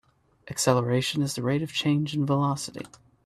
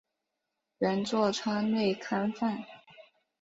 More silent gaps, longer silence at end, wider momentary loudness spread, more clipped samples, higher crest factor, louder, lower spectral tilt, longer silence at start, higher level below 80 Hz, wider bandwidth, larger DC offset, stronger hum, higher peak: neither; about the same, 0.4 s vs 0.4 s; first, 13 LU vs 5 LU; neither; about the same, 22 dB vs 18 dB; first, -26 LUFS vs -30 LUFS; about the same, -5 dB/octave vs -5.5 dB/octave; second, 0.45 s vs 0.8 s; first, -62 dBFS vs -72 dBFS; first, 14 kHz vs 7.8 kHz; neither; neither; first, -6 dBFS vs -14 dBFS